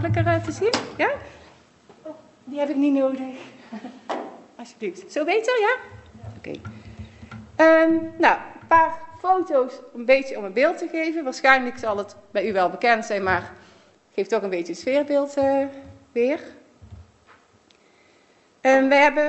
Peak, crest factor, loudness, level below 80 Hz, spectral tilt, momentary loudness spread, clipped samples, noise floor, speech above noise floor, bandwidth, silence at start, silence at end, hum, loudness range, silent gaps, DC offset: 0 dBFS; 22 dB; -22 LUFS; -56 dBFS; -5.5 dB/octave; 23 LU; under 0.1%; -58 dBFS; 37 dB; 8.2 kHz; 0 s; 0 s; none; 7 LU; none; under 0.1%